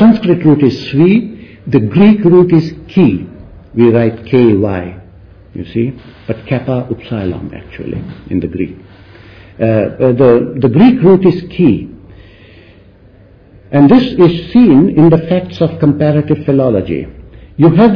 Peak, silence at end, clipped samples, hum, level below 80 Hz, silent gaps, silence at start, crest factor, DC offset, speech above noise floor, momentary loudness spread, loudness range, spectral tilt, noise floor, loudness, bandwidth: 0 dBFS; 0 s; 0.3%; none; -38 dBFS; none; 0 s; 10 dB; under 0.1%; 31 dB; 16 LU; 10 LU; -10 dB/octave; -41 dBFS; -10 LUFS; 5.4 kHz